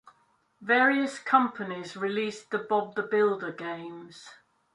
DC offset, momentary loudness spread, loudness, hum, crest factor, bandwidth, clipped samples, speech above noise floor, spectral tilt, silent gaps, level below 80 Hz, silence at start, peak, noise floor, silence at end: under 0.1%; 19 LU; -27 LUFS; none; 20 dB; 11 kHz; under 0.1%; 40 dB; -5 dB/octave; none; -80 dBFS; 0.6 s; -8 dBFS; -68 dBFS; 0.4 s